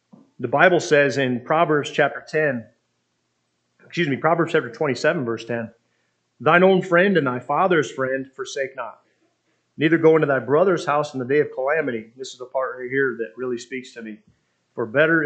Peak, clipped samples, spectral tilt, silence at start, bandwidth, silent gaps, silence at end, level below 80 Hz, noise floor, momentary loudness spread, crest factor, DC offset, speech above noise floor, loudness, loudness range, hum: 0 dBFS; under 0.1%; -6 dB/octave; 0.4 s; 8.8 kHz; none; 0 s; -74 dBFS; -72 dBFS; 16 LU; 20 dB; under 0.1%; 52 dB; -20 LUFS; 4 LU; none